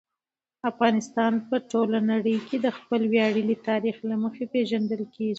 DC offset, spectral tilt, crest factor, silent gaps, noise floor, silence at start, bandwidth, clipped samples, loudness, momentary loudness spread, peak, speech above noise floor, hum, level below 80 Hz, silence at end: under 0.1%; -6 dB/octave; 20 dB; none; under -90 dBFS; 0.65 s; 8 kHz; under 0.1%; -26 LUFS; 6 LU; -6 dBFS; over 65 dB; none; -74 dBFS; 0 s